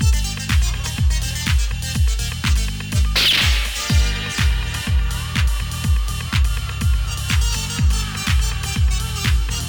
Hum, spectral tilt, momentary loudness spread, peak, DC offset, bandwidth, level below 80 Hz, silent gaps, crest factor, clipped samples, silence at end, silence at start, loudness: none; -3.5 dB/octave; 5 LU; -4 dBFS; under 0.1%; over 20 kHz; -20 dBFS; none; 14 dB; under 0.1%; 0 s; 0 s; -20 LUFS